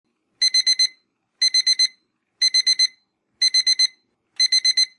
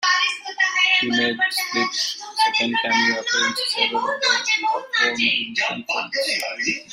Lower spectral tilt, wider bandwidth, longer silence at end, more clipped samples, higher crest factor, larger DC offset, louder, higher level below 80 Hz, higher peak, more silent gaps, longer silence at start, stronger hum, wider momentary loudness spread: second, 7 dB/octave vs -1 dB/octave; second, 11 kHz vs 16 kHz; about the same, 0.1 s vs 0 s; neither; about the same, 12 dB vs 16 dB; neither; about the same, -17 LUFS vs -19 LUFS; second, -76 dBFS vs -68 dBFS; about the same, -8 dBFS vs -6 dBFS; neither; first, 0.4 s vs 0 s; neither; about the same, 5 LU vs 5 LU